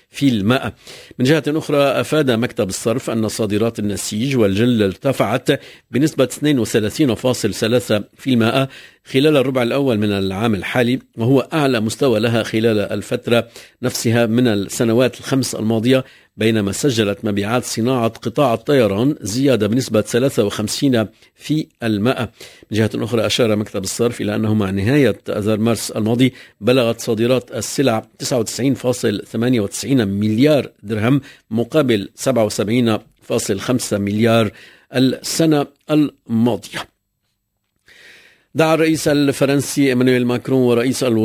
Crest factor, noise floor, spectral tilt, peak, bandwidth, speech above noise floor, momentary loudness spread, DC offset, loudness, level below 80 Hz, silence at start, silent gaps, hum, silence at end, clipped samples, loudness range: 16 dB; -71 dBFS; -5.5 dB/octave; 0 dBFS; 16 kHz; 54 dB; 6 LU; under 0.1%; -17 LUFS; -48 dBFS; 0.15 s; none; none; 0 s; under 0.1%; 2 LU